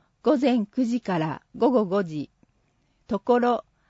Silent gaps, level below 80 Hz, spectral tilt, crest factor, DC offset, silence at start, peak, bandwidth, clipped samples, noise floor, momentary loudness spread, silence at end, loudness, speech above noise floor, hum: none; -64 dBFS; -7.5 dB/octave; 16 dB; under 0.1%; 0.25 s; -10 dBFS; 8 kHz; under 0.1%; -67 dBFS; 11 LU; 0.3 s; -24 LUFS; 44 dB; none